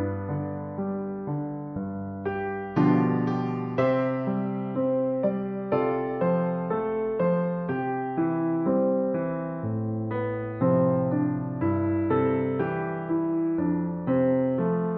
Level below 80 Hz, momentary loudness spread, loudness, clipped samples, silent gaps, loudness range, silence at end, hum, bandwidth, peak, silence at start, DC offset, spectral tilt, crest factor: -60 dBFS; 8 LU; -27 LUFS; under 0.1%; none; 2 LU; 0 s; none; 5.2 kHz; -10 dBFS; 0 s; under 0.1%; -9 dB/octave; 16 dB